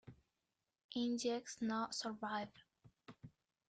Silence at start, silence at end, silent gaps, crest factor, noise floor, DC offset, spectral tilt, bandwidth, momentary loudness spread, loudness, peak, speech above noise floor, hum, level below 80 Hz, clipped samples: 0.05 s; 0.4 s; 0.84-0.89 s; 18 dB; under -90 dBFS; under 0.1%; -3.5 dB/octave; 9.4 kHz; 23 LU; -42 LUFS; -28 dBFS; over 48 dB; none; -80 dBFS; under 0.1%